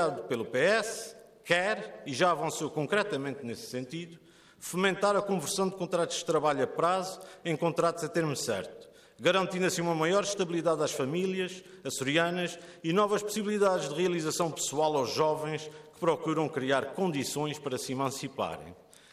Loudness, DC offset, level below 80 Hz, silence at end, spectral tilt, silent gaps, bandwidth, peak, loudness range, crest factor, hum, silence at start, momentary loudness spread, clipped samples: -30 LUFS; under 0.1%; -72 dBFS; 0.4 s; -4 dB/octave; none; 15 kHz; -12 dBFS; 2 LU; 18 dB; none; 0 s; 11 LU; under 0.1%